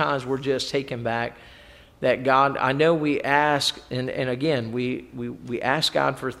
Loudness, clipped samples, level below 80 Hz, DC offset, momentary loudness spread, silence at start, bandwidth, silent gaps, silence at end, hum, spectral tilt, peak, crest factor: -23 LUFS; under 0.1%; -56 dBFS; under 0.1%; 10 LU; 0 s; 15 kHz; none; 0 s; none; -4.5 dB/octave; -4 dBFS; 20 dB